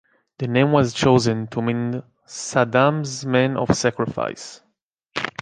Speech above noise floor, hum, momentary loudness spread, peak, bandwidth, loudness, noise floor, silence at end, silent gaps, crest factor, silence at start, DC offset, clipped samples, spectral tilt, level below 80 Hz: 51 dB; none; 14 LU; -2 dBFS; 9.8 kHz; -20 LUFS; -71 dBFS; 0 s; 4.82-4.91 s; 18 dB; 0.4 s; under 0.1%; under 0.1%; -5.5 dB/octave; -50 dBFS